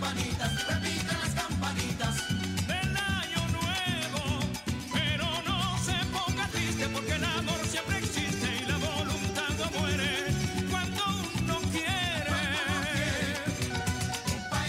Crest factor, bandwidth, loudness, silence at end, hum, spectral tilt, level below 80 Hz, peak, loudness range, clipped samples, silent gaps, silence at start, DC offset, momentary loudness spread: 14 dB; 16 kHz; -30 LUFS; 0 s; none; -4 dB/octave; -48 dBFS; -16 dBFS; 1 LU; under 0.1%; none; 0 s; under 0.1%; 3 LU